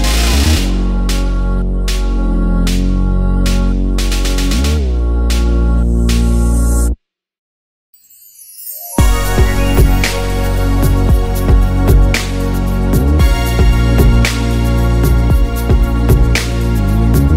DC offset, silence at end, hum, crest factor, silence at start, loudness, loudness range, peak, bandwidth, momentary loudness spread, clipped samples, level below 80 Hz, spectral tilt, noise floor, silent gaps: under 0.1%; 0 s; none; 12 dB; 0 s; -14 LUFS; 4 LU; 0 dBFS; 16 kHz; 5 LU; under 0.1%; -12 dBFS; -5.5 dB/octave; -41 dBFS; 7.38-7.93 s